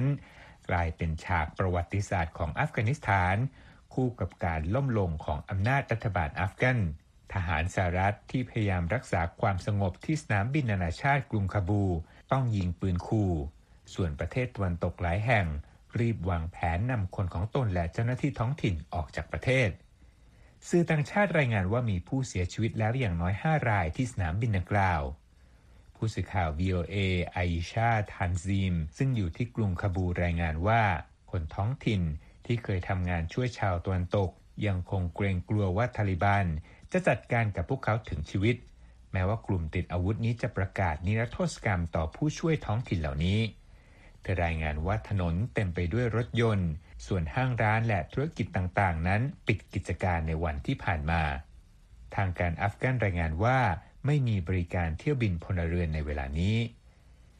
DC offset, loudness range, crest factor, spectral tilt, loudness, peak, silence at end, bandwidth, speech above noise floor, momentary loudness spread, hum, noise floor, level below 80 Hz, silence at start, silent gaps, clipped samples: under 0.1%; 2 LU; 18 dB; -7 dB/octave; -30 LUFS; -12 dBFS; 0.65 s; 10 kHz; 29 dB; 7 LU; none; -58 dBFS; -44 dBFS; 0 s; none; under 0.1%